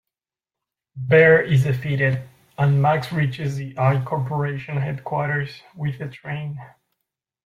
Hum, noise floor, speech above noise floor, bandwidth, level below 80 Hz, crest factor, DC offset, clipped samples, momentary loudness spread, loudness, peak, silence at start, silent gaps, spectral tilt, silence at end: none; -90 dBFS; 69 dB; 11 kHz; -56 dBFS; 18 dB; under 0.1%; under 0.1%; 16 LU; -21 LUFS; -4 dBFS; 0.95 s; none; -8 dB/octave; 0.75 s